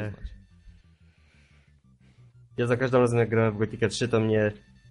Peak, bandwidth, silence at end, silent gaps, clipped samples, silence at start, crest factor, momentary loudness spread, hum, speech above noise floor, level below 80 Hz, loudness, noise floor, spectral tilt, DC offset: -8 dBFS; 11 kHz; 0.35 s; none; under 0.1%; 0 s; 20 dB; 16 LU; none; 34 dB; -52 dBFS; -25 LUFS; -59 dBFS; -6.5 dB/octave; under 0.1%